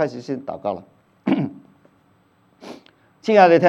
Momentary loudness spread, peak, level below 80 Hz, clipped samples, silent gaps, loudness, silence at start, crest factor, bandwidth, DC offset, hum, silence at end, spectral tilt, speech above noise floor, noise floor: 26 LU; 0 dBFS; -70 dBFS; under 0.1%; none; -21 LUFS; 0 s; 20 dB; 7.8 kHz; under 0.1%; none; 0 s; -7 dB/octave; 42 dB; -59 dBFS